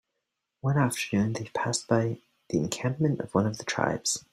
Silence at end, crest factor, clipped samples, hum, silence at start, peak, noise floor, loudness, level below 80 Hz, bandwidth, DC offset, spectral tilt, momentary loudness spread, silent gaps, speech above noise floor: 0.15 s; 22 dB; under 0.1%; none; 0.65 s; -8 dBFS; -83 dBFS; -28 LUFS; -62 dBFS; 16 kHz; under 0.1%; -5 dB/octave; 5 LU; none; 55 dB